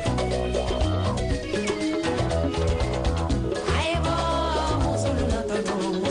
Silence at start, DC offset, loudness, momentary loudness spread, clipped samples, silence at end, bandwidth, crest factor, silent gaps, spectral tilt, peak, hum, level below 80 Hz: 0 s; under 0.1%; -25 LUFS; 2 LU; under 0.1%; 0 s; 10.5 kHz; 10 dB; none; -5.5 dB/octave; -14 dBFS; none; -32 dBFS